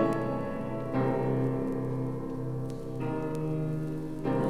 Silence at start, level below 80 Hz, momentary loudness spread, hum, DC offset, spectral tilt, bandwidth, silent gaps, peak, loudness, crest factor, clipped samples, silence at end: 0 s; -48 dBFS; 7 LU; none; under 0.1%; -9 dB/octave; 12.5 kHz; none; -14 dBFS; -32 LUFS; 16 dB; under 0.1%; 0 s